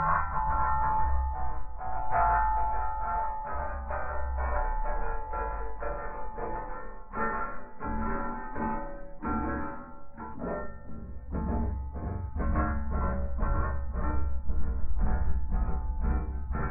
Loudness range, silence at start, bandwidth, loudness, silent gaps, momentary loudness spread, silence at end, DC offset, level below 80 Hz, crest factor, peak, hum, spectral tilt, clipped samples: 6 LU; 0 s; 2.8 kHz; -33 LUFS; none; 11 LU; 0 s; under 0.1%; -34 dBFS; 16 dB; -12 dBFS; none; -13 dB/octave; under 0.1%